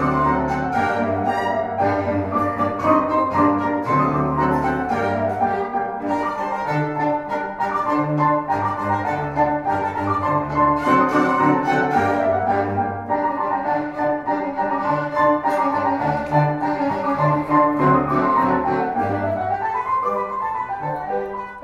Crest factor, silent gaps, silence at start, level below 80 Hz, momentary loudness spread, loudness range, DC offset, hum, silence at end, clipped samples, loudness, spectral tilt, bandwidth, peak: 16 dB; none; 0 s; -46 dBFS; 6 LU; 3 LU; under 0.1%; none; 0 s; under 0.1%; -20 LUFS; -8 dB/octave; 12.5 kHz; -4 dBFS